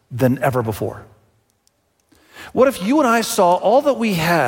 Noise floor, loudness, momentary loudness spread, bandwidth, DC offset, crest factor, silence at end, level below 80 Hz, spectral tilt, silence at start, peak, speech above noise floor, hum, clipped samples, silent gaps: -63 dBFS; -17 LUFS; 11 LU; 17 kHz; under 0.1%; 16 dB; 0 s; -54 dBFS; -5.5 dB/octave; 0.1 s; -2 dBFS; 47 dB; none; under 0.1%; none